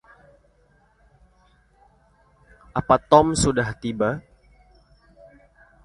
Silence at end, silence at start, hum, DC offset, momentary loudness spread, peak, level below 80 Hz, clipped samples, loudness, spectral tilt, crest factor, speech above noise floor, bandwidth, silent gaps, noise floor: 1.65 s; 2.75 s; none; under 0.1%; 14 LU; 0 dBFS; -46 dBFS; under 0.1%; -21 LUFS; -5 dB/octave; 24 dB; 40 dB; 11.5 kHz; none; -60 dBFS